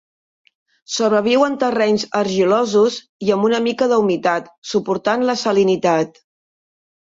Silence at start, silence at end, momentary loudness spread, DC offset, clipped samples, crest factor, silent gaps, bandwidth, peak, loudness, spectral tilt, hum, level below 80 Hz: 0.9 s; 0.95 s; 7 LU; under 0.1%; under 0.1%; 14 dB; 3.09-3.19 s, 4.58-4.62 s; 7.8 kHz; -4 dBFS; -17 LUFS; -4.5 dB/octave; none; -62 dBFS